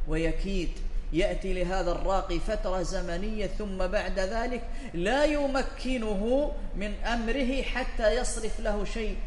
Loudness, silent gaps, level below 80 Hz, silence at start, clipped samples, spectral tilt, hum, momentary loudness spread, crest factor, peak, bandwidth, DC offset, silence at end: -30 LUFS; none; -32 dBFS; 0 s; under 0.1%; -5 dB/octave; none; 7 LU; 18 dB; -10 dBFS; 11.5 kHz; under 0.1%; 0 s